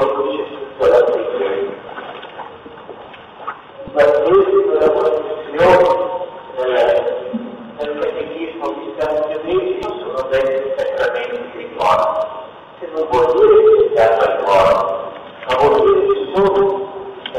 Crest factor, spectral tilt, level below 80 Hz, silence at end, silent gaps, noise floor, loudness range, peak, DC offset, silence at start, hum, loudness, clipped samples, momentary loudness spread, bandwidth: 14 dB; -6 dB/octave; -48 dBFS; 0 s; none; -36 dBFS; 7 LU; -2 dBFS; under 0.1%; 0 s; none; -15 LUFS; under 0.1%; 18 LU; 9.6 kHz